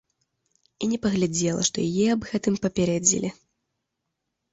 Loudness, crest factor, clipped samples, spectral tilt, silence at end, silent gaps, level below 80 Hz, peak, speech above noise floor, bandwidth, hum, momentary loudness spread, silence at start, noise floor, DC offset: -24 LUFS; 22 dB; under 0.1%; -4 dB/octave; 1.2 s; none; -56 dBFS; -4 dBFS; 57 dB; 8 kHz; none; 7 LU; 0.8 s; -81 dBFS; under 0.1%